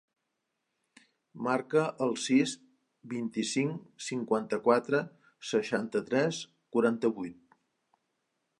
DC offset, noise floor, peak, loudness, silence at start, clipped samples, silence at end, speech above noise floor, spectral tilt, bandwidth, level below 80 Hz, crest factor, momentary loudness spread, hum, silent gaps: under 0.1%; -83 dBFS; -10 dBFS; -31 LUFS; 1.35 s; under 0.1%; 1.25 s; 53 dB; -5 dB/octave; 11.5 kHz; -80 dBFS; 22 dB; 13 LU; none; none